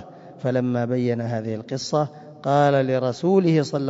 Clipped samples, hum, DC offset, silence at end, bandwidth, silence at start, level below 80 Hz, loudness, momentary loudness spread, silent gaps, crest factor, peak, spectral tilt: under 0.1%; none; under 0.1%; 0 s; 7.8 kHz; 0 s; -66 dBFS; -22 LUFS; 11 LU; none; 16 dB; -6 dBFS; -7 dB/octave